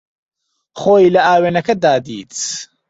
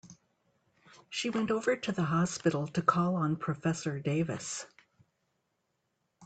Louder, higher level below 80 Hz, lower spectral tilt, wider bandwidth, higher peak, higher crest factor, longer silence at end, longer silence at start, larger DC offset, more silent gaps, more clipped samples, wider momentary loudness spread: first, -14 LUFS vs -32 LUFS; first, -56 dBFS vs -68 dBFS; about the same, -4.5 dB/octave vs -5.5 dB/octave; second, 8.2 kHz vs 9.2 kHz; first, -2 dBFS vs -8 dBFS; second, 14 dB vs 24 dB; first, 0.25 s vs 0 s; first, 0.75 s vs 0.05 s; neither; neither; neither; first, 12 LU vs 9 LU